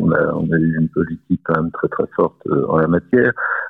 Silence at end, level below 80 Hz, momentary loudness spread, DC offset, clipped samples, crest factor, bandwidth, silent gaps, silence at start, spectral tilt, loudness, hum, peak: 0 s; -50 dBFS; 6 LU; under 0.1%; under 0.1%; 16 dB; 3.8 kHz; none; 0 s; -11.5 dB/octave; -18 LUFS; none; -2 dBFS